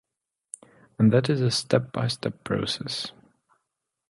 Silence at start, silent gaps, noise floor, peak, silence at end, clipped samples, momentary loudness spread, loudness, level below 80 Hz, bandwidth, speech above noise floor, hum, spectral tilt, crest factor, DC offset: 1 s; none; -85 dBFS; -6 dBFS; 1 s; under 0.1%; 22 LU; -25 LUFS; -60 dBFS; 11.5 kHz; 61 dB; none; -5.5 dB/octave; 22 dB; under 0.1%